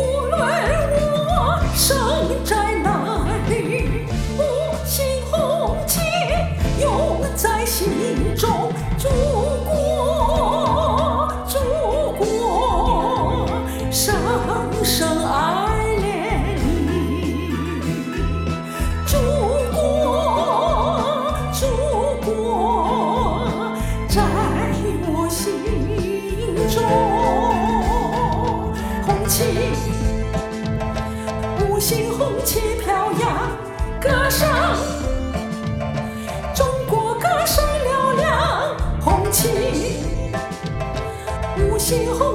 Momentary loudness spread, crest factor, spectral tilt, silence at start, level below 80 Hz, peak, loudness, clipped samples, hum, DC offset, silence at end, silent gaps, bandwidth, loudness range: 7 LU; 16 dB; -5 dB/octave; 0 s; -28 dBFS; -2 dBFS; -20 LUFS; under 0.1%; none; under 0.1%; 0 s; none; 20 kHz; 2 LU